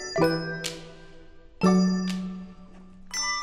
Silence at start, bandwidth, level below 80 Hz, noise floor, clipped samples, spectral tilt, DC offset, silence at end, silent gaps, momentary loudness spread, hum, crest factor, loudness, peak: 0 s; 13.5 kHz; -50 dBFS; -47 dBFS; under 0.1%; -5 dB/octave; under 0.1%; 0 s; none; 20 LU; none; 18 dB; -26 LUFS; -8 dBFS